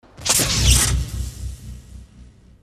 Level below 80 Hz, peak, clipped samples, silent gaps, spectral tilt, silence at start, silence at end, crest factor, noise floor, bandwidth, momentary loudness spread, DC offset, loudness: -26 dBFS; -2 dBFS; under 0.1%; none; -2.5 dB/octave; 0.2 s; 0.4 s; 20 dB; -46 dBFS; 16 kHz; 21 LU; under 0.1%; -17 LUFS